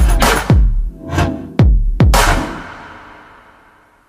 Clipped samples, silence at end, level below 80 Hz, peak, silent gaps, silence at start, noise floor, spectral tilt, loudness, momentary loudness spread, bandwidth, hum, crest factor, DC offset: under 0.1%; 1.05 s; -16 dBFS; 0 dBFS; none; 0 s; -48 dBFS; -5 dB/octave; -14 LUFS; 18 LU; 15.5 kHz; none; 14 dB; under 0.1%